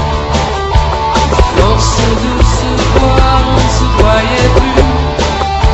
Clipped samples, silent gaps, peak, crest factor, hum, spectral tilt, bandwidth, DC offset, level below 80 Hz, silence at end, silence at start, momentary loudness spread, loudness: 0.8%; none; 0 dBFS; 10 dB; none; -5 dB/octave; 8.2 kHz; under 0.1%; -14 dBFS; 0 s; 0 s; 4 LU; -10 LUFS